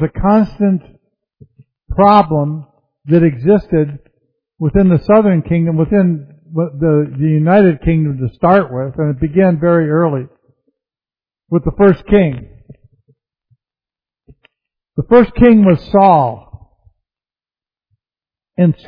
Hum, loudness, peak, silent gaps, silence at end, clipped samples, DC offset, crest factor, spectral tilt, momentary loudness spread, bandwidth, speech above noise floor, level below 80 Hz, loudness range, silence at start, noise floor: none; -13 LUFS; 0 dBFS; none; 0.15 s; under 0.1%; under 0.1%; 14 dB; -11.5 dB/octave; 12 LU; 5.2 kHz; over 79 dB; -34 dBFS; 5 LU; 0 s; under -90 dBFS